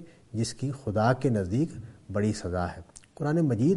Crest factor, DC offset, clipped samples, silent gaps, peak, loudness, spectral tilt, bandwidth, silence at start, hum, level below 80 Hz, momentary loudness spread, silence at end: 18 dB; under 0.1%; under 0.1%; none; -10 dBFS; -29 LUFS; -7 dB/octave; 11.5 kHz; 0 s; none; -54 dBFS; 11 LU; 0 s